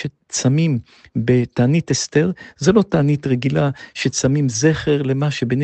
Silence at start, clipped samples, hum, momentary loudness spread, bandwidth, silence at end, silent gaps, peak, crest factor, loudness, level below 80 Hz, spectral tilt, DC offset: 0 s; under 0.1%; none; 6 LU; 8.8 kHz; 0 s; none; 0 dBFS; 16 dB; -18 LUFS; -48 dBFS; -5.5 dB/octave; under 0.1%